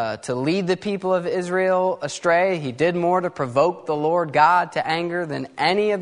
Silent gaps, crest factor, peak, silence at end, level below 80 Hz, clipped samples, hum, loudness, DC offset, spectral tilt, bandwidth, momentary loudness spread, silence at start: none; 18 dB; -2 dBFS; 0 s; -64 dBFS; under 0.1%; none; -21 LUFS; under 0.1%; -5.5 dB/octave; 10.5 kHz; 7 LU; 0 s